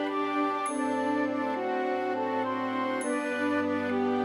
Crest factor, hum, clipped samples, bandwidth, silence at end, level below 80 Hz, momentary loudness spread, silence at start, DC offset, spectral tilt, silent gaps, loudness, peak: 12 dB; none; under 0.1%; 12.5 kHz; 0 s; -82 dBFS; 2 LU; 0 s; under 0.1%; -4.5 dB/octave; none; -29 LUFS; -18 dBFS